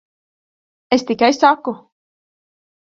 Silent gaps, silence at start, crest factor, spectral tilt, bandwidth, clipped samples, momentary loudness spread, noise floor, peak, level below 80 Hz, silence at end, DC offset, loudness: none; 0.9 s; 20 dB; -3.5 dB/octave; 7.8 kHz; under 0.1%; 14 LU; under -90 dBFS; 0 dBFS; -62 dBFS; 1.2 s; under 0.1%; -16 LUFS